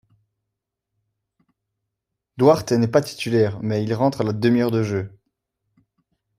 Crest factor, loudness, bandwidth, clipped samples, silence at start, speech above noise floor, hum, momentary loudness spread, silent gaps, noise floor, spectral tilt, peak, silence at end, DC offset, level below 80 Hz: 20 dB; -20 LUFS; 15.5 kHz; under 0.1%; 2.35 s; 63 dB; none; 8 LU; none; -82 dBFS; -7 dB/octave; -2 dBFS; 1.3 s; under 0.1%; -60 dBFS